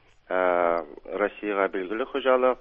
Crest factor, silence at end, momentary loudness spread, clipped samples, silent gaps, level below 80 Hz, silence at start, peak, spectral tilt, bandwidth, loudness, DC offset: 18 dB; 0.05 s; 8 LU; under 0.1%; none; -60 dBFS; 0.3 s; -8 dBFS; -7.5 dB/octave; 5 kHz; -26 LUFS; under 0.1%